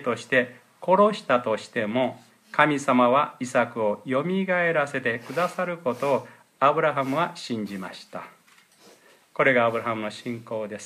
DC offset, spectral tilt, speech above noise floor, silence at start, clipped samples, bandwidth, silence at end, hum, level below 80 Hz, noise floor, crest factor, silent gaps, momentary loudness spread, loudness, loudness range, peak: under 0.1%; -5.5 dB/octave; 33 dB; 0 s; under 0.1%; 15 kHz; 0 s; none; -74 dBFS; -57 dBFS; 22 dB; none; 13 LU; -24 LUFS; 5 LU; -4 dBFS